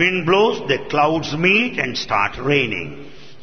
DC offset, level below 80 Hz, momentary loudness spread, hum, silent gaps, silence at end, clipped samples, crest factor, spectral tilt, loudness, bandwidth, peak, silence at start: 1%; -48 dBFS; 8 LU; none; none; 0.1 s; under 0.1%; 16 dB; -5 dB/octave; -18 LUFS; 6.6 kHz; -4 dBFS; 0 s